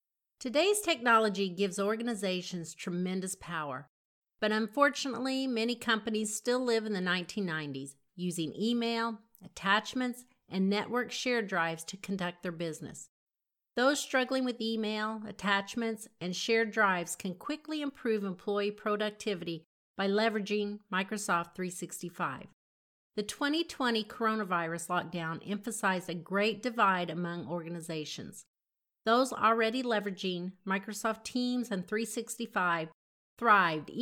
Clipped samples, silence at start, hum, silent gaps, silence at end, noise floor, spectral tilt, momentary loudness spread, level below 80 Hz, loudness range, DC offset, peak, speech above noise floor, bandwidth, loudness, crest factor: under 0.1%; 0.4 s; none; 3.89-4.22 s, 13.09-13.27 s, 19.66-19.94 s, 22.53-23.10 s, 28.48-28.54 s, 32.94-33.37 s; 0 s; -90 dBFS; -4 dB/octave; 11 LU; -76 dBFS; 3 LU; under 0.1%; -12 dBFS; 57 dB; 17.5 kHz; -32 LUFS; 20 dB